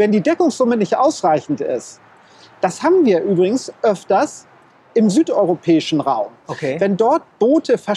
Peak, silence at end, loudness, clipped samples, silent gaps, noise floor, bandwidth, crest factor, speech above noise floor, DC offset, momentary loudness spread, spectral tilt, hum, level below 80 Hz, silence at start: -2 dBFS; 0 s; -17 LUFS; under 0.1%; none; -46 dBFS; 11.5 kHz; 14 dB; 30 dB; under 0.1%; 8 LU; -6 dB/octave; none; -68 dBFS; 0 s